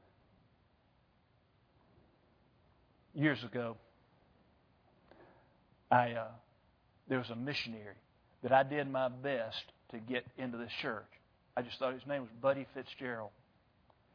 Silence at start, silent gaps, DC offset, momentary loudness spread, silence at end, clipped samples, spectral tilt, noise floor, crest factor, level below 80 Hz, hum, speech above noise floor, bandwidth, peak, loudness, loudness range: 3.15 s; none; under 0.1%; 16 LU; 0.85 s; under 0.1%; -3.5 dB/octave; -72 dBFS; 26 dB; -76 dBFS; none; 35 dB; 5.4 kHz; -14 dBFS; -37 LUFS; 5 LU